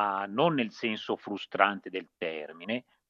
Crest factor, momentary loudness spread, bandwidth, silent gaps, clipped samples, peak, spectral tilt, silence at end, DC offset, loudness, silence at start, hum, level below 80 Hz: 26 dB; 10 LU; 7.4 kHz; none; under 0.1%; -6 dBFS; -6 dB/octave; 0.3 s; under 0.1%; -31 LUFS; 0 s; none; -82 dBFS